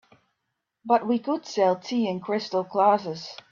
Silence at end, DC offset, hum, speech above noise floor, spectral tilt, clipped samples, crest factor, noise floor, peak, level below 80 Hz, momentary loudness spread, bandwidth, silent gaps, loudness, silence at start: 0.15 s; under 0.1%; none; 56 dB; -5.5 dB/octave; under 0.1%; 18 dB; -81 dBFS; -8 dBFS; -74 dBFS; 10 LU; 7.4 kHz; none; -25 LUFS; 0.85 s